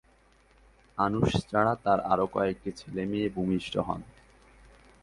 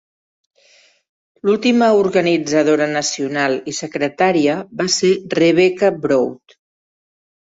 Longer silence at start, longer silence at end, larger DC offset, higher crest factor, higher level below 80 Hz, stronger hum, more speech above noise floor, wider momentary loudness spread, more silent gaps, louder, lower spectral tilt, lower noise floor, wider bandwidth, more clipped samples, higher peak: second, 0.95 s vs 1.45 s; second, 0.95 s vs 1.2 s; neither; about the same, 20 dB vs 16 dB; first, -52 dBFS vs -60 dBFS; neither; about the same, 34 dB vs 37 dB; about the same, 10 LU vs 8 LU; neither; second, -29 LUFS vs -16 LUFS; first, -7 dB/octave vs -4 dB/octave; first, -62 dBFS vs -53 dBFS; first, 11.5 kHz vs 8 kHz; neither; second, -10 dBFS vs -2 dBFS